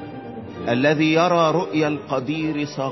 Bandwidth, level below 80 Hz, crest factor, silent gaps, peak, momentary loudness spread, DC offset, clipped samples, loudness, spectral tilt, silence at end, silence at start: 6.2 kHz; -56 dBFS; 16 dB; none; -6 dBFS; 15 LU; under 0.1%; under 0.1%; -20 LUFS; -6 dB/octave; 0 s; 0 s